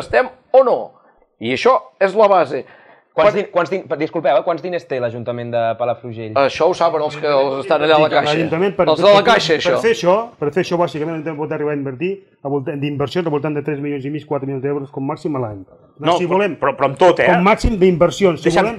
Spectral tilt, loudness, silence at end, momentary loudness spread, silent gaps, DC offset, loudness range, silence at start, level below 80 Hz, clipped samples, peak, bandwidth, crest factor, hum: -6 dB/octave; -16 LUFS; 0 s; 11 LU; none; under 0.1%; 8 LU; 0 s; -40 dBFS; under 0.1%; -2 dBFS; 11.5 kHz; 14 dB; none